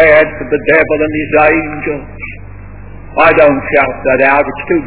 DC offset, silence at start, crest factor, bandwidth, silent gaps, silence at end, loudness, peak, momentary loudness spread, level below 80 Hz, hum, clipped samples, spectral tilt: 2%; 0 s; 12 dB; 4 kHz; none; 0 s; -10 LUFS; 0 dBFS; 15 LU; -34 dBFS; none; 0.9%; -9.5 dB/octave